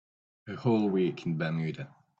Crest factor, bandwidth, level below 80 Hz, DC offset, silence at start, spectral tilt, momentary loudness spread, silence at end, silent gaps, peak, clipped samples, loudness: 14 dB; 7.4 kHz; -68 dBFS; under 0.1%; 0.45 s; -8.5 dB/octave; 17 LU; 0.3 s; none; -16 dBFS; under 0.1%; -30 LUFS